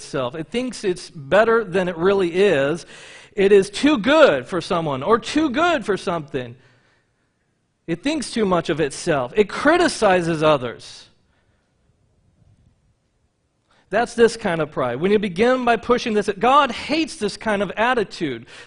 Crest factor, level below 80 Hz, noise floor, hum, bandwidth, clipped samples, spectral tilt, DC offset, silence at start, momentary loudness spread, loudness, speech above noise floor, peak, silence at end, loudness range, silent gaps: 20 dB; -52 dBFS; -68 dBFS; none; 10.5 kHz; under 0.1%; -5 dB/octave; under 0.1%; 0 s; 11 LU; -19 LUFS; 49 dB; 0 dBFS; 0 s; 7 LU; none